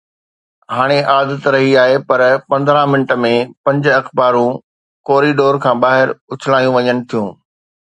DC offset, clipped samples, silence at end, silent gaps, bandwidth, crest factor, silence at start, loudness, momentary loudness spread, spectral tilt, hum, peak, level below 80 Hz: under 0.1%; under 0.1%; 0.6 s; 3.57-3.64 s, 4.64-5.04 s, 6.21-6.28 s; 10.5 kHz; 14 dB; 0.7 s; -13 LUFS; 8 LU; -6.5 dB/octave; none; 0 dBFS; -62 dBFS